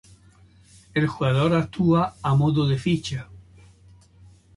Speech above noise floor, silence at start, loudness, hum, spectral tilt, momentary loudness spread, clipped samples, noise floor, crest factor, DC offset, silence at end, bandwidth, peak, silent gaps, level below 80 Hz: 32 dB; 0.95 s; -22 LUFS; none; -7.5 dB/octave; 7 LU; under 0.1%; -53 dBFS; 16 dB; under 0.1%; 1.15 s; 11.5 kHz; -8 dBFS; none; -50 dBFS